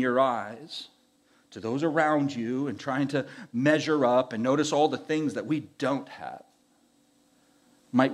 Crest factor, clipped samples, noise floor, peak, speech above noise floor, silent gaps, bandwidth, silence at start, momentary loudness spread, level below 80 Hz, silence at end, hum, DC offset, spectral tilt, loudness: 20 dB; under 0.1%; -65 dBFS; -8 dBFS; 38 dB; none; 11.5 kHz; 0 s; 16 LU; -80 dBFS; 0 s; none; under 0.1%; -5.5 dB/octave; -27 LUFS